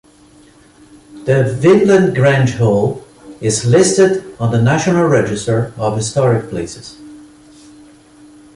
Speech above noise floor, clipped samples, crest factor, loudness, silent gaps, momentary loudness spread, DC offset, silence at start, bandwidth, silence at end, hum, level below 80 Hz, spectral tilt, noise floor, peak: 32 dB; under 0.1%; 14 dB; -13 LUFS; none; 14 LU; under 0.1%; 1.1 s; 11.5 kHz; 1.35 s; none; -46 dBFS; -6 dB/octave; -45 dBFS; 0 dBFS